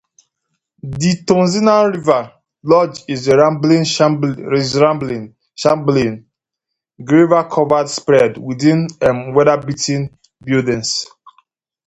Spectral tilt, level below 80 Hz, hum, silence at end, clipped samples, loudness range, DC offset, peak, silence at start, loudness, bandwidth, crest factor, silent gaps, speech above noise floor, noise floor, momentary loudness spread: -5.5 dB/octave; -50 dBFS; none; 0.85 s; under 0.1%; 3 LU; under 0.1%; 0 dBFS; 0.85 s; -14 LUFS; 9 kHz; 16 dB; none; 66 dB; -80 dBFS; 15 LU